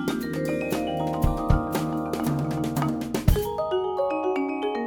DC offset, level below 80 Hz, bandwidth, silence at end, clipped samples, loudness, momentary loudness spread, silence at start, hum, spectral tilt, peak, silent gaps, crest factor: under 0.1%; -32 dBFS; over 20 kHz; 0 s; under 0.1%; -26 LUFS; 3 LU; 0 s; none; -6.5 dB/octave; -6 dBFS; none; 20 dB